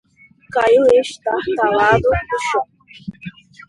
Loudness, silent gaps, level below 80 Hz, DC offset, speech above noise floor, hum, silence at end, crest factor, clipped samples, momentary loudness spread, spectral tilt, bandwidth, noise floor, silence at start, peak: -16 LUFS; none; -40 dBFS; under 0.1%; 32 dB; none; 0.4 s; 16 dB; under 0.1%; 22 LU; -5 dB/octave; 11.5 kHz; -48 dBFS; 0.5 s; 0 dBFS